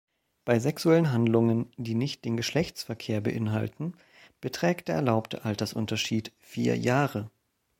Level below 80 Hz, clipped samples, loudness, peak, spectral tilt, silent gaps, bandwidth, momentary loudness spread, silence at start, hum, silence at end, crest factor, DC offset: -62 dBFS; under 0.1%; -28 LUFS; -8 dBFS; -6 dB/octave; none; 16.5 kHz; 13 LU; 0.45 s; none; 0.5 s; 20 dB; under 0.1%